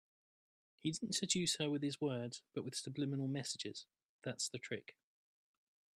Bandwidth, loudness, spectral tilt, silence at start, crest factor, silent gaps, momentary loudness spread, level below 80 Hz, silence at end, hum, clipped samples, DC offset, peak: 14.5 kHz; -41 LUFS; -3.5 dB/octave; 0.85 s; 22 dB; 4.05-4.19 s; 12 LU; -80 dBFS; 1.05 s; none; under 0.1%; under 0.1%; -20 dBFS